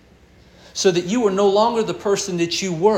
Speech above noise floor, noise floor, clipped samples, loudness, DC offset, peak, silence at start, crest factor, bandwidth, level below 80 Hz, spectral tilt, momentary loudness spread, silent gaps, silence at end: 31 dB; -50 dBFS; under 0.1%; -19 LUFS; under 0.1%; -4 dBFS; 0.75 s; 16 dB; 13 kHz; -54 dBFS; -4 dB/octave; 5 LU; none; 0 s